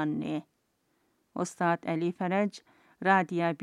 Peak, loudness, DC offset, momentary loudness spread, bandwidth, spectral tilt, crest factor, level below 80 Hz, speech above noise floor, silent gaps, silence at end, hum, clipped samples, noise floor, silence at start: -10 dBFS; -30 LUFS; under 0.1%; 12 LU; 12 kHz; -6 dB/octave; 22 dB; -78 dBFS; 45 dB; none; 0 s; none; under 0.1%; -74 dBFS; 0 s